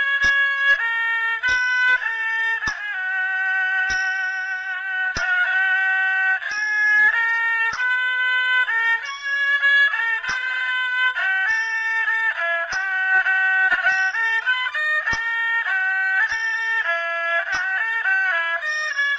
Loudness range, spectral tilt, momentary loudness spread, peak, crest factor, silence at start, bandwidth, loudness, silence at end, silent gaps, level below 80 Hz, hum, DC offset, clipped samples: 2 LU; 0 dB/octave; 6 LU; -6 dBFS; 14 dB; 0 s; 8 kHz; -19 LUFS; 0 s; none; -54 dBFS; none; under 0.1%; under 0.1%